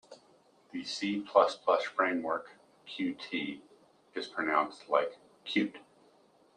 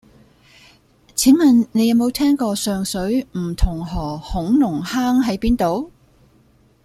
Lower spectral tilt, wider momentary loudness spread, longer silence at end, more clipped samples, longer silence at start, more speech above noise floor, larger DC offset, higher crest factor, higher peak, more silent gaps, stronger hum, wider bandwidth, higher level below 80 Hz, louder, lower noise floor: about the same, -4.5 dB/octave vs -5 dB/octave; first, 15 LU vs 12 LU; second, 0.75 s vs 0.95 s; neither; second, 0.1 s vs 1.15 s; second, 33 dB vs 37 dB; neither; first, 24 dB vs 16 dB; second, -10 dBFS vs -2 dBFS; neither; neither; second, 10 kHz vs 15.5 kHz; second, -82 dBFS vs -32 dBFS; second, -32 LUFS vs -18 LUFS; first, -65 dBFS vs -54 dBFS